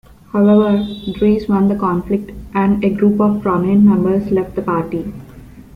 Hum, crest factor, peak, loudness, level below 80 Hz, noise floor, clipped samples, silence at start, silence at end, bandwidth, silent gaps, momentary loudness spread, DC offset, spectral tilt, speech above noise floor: none; 12 dB; -2 dBFS; -15 LUFS; -40 dBFS; -37 dBFS; under 0.1%; 0.35 s; 0.15 s; 4.9 kHz; none; 11 LU; under 0.1%; -9.5 dB/octave; 23 dB